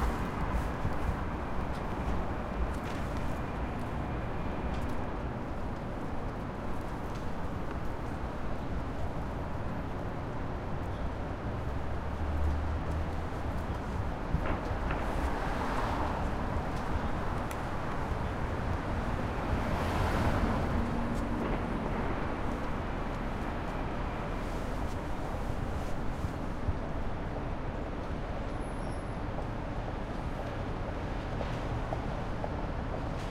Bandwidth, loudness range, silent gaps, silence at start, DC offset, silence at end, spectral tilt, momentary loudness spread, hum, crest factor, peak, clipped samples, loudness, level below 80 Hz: 15 kHz; 5 LU; none; 0 s; under 0.1%; 0 s; -7 dB/octave; 5 LU; none; 16 dB; -16 dBFS; under 0.1%; -36 LUFS; -38 dBFS